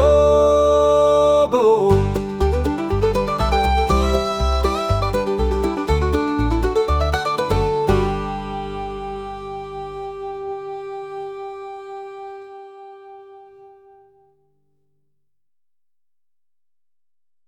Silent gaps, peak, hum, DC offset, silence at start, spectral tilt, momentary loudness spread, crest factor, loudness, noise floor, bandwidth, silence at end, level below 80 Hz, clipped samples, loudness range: none; -4 dBFS; none; under 0.1%; 0 s; -6.5 dB/octave; 18 LU; 16 dB; -19 LUFS; under -90 dBFS; 17.5 kHz; 3.8 s; -28 dBFS; under 0.1%; 18 LU